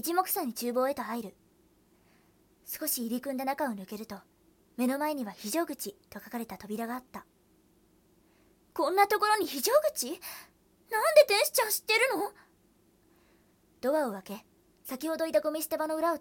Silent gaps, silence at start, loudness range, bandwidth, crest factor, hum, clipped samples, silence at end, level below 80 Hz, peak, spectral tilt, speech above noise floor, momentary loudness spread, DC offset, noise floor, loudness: none; 0.05 s; 10 LU; 18 kHz; 24 dB; none; under 0.1%; 0 s; -72 dBFS; -8 dBFS; -2 dB/octave; 36 dB; 17 LU; under 0.1%; -66 dBFS; -30 LUFS